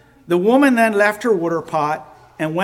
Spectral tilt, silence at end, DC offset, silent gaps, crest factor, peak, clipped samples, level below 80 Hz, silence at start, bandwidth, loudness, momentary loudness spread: -6 dB/octave; 0 s; under 0.1%; none; 16 dB; -2 dBFS; under 0.1%; -60 dBFS; 0.3 s; 16.5 kHz; -17 LUFS; 10 LU